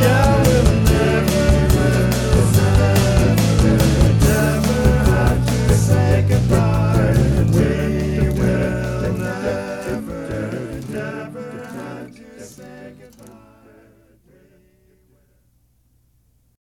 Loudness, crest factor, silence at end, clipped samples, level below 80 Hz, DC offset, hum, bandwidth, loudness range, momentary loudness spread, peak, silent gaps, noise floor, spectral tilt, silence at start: -17 LUFS; 16 dB; 3.8 s; under 0.1%; -24 dBFS; under 0.1%; none; 18 kHz; 16 LU; 16 LU; -2 dBFS; none; -59 dBFS; -6.5 dB/octave; 0 s